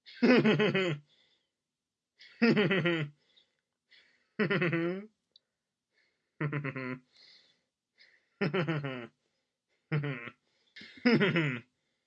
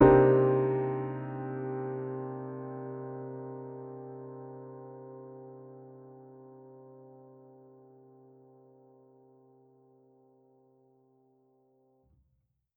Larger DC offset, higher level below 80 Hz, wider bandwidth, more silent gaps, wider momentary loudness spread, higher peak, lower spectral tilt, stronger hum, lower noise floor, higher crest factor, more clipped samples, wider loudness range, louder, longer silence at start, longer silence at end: neither; second, -84 dBFS vs -56 dBFS; first, 7.6 kHz vs 3.4 kHz; neither; second, 17 LU vs 26 LU; second, -12 dBFS vs -8 dBFS; second, -7.5 dB/octave vs -9 dB/octave; neither; first, under -90 dBFS vs -76 dBFS; about the same, 22 dB vs 26 dB; neither; second, 8 LU vs 25 LU; about the same, -30 LUFS vs -31 LUFS; about the same, 0.05 s vs 0 s; second, 0.45 s vs 5.7 s